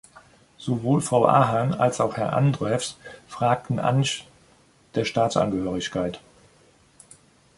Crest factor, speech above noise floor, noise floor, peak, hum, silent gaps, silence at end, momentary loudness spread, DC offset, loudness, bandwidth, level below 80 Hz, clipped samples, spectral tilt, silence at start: 22 dB; 35 dB; -58 dBFS; -2 dBFS; none; none; 1.4 s; 13 LU; under 0.1%; -23 LUFS; 11.5 kHz; -56 dBFS; under 0.1%; -6 dB/octave; 0.6 s